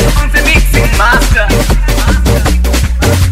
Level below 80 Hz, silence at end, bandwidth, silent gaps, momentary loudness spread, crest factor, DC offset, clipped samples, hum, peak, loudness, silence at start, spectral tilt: -10 dBFS; 0 s; 16 kHz; none; 3 LU; 8 dB; 0.6%; under 0.1%; none; 0 dBFS; -10 LUFS; 0 s; -4.5 dB/octave